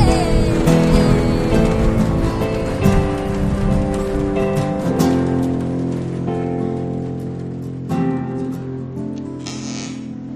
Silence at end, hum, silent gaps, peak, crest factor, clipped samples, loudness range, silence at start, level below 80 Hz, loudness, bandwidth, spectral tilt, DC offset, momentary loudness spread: 0 s; none; none; 0 dBFS; 18 dB; under 0.1%; 8 LU; 0 s; -26 dBFS; -19 LUFS; 13.5 kHz; -7 dB/octave; under 0.1%; 12 LU